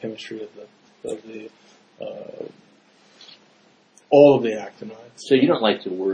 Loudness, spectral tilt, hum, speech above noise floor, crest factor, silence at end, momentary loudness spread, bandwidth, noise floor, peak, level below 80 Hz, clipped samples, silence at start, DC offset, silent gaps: -18 LUFS; -6 dB/octave; none; 36 dB; 22 dB; 0 s; 25 LU; 9.8 kHz; -57 dBFS; 0 dBFS; -68 dBFS; under 0.1%; 0 s; under 0.1%; none